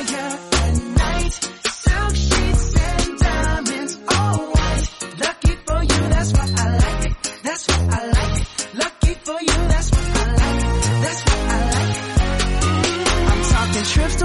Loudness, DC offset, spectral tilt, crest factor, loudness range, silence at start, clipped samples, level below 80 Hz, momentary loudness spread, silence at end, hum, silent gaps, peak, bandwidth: -19 LUFS; under 0.1%; -4.5 dB/octave; 14 dB; 2 LU; 0 s; under 0.1%; -22 dBFS; 5 LU; 0 s; none; none; -4 dBFS; 11.5 kHz